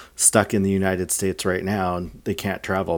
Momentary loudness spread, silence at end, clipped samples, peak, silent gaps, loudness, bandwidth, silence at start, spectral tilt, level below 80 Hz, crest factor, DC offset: 10 LU; 0 s; under 0.1%; 0 dBFS; none; -22 LUFS; over 20 kHz; 0 s; -4 dB/octave; -52 dBFS; 22 dB; under 0.1%